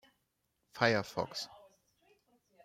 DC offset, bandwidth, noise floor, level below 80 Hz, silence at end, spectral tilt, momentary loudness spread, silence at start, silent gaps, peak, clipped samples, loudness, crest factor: under 0.1%; 16 kHz; -81 dBFS; -74 dBFS; 1.1 s; -4.5 dB/octave; 16 LU; 0.75 s; none; -14 dBFS; under 0.1%; -34 LUFS; 26 dB